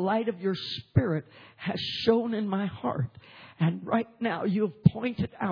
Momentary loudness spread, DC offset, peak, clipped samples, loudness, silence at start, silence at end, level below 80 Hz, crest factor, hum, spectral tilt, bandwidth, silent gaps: 9 LU; under 0.1%; -4 dBFS; under 0.1%; -29 LUFS; 0 s; 0 s; -56 dBFS; 24 dB; none; -8.5 dB/octave; 5.4 kHz; none